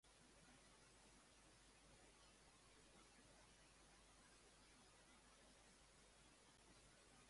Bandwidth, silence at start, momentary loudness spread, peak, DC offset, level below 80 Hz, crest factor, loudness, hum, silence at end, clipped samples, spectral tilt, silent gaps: 11.5 kHz; 0.05 s; 1 LU; -56 dBFS; under 0.1%; -80 dBFS; 14 dB; -69 LUFS; none; 0 s; under 0.1%; -2.5 dB/octave; none